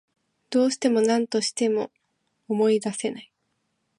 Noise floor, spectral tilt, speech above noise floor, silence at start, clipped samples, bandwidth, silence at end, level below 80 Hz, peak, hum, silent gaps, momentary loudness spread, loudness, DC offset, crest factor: -75 dBFS; -4 dB/octave; 52 dB; 0.5 s; under 0.1%; 11.5 kHz; 0.75 s; -76 dBFS; -8 dBFS; none; none; 9 LU; -24 LUFS; under 0.1%; 16 dB